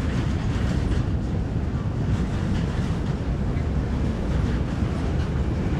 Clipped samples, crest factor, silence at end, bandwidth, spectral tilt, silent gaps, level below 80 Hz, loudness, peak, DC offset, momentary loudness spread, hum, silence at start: under 0.1%; 12 dB; 0 s; 10 kHz; -7.5 dB/octave; none; -28 dBFS; -26 LUFS; -12 dBFS; under 0.1%; 2 LU; none; 0 s